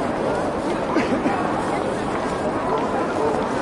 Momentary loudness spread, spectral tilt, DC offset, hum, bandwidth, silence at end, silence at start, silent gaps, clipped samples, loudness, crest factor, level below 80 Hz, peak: 3 LU; -6 dB/octave; under 0.1%; none; 11.5 kHz; 0 s; 0 s; none; under 0.1%; -22 LUFS; 14 dB; -46 dBFS; -8 dBFS